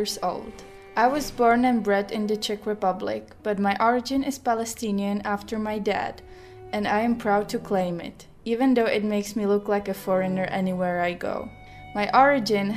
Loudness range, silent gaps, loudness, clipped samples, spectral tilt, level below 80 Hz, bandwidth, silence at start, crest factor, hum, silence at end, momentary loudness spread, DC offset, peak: 3 LU; none; -25 LUFS; under 0.1%; -5 dB/octave; -52 dBFS; 15.5 kHz; 0 s; 20 dB; none; 0 s; 13 LU; under 0.1%; -4 dBFS